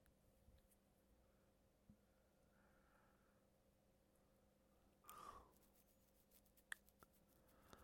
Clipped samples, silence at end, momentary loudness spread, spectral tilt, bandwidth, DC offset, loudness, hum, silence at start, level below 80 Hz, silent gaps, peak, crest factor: under 0.1%; 0 s; 9 LU; -3 dB/octave; 17 kHz; under 0.1%; -61 LUFS; none; 0 s; -82 dBFS; none; -32 dBFS; 38 dB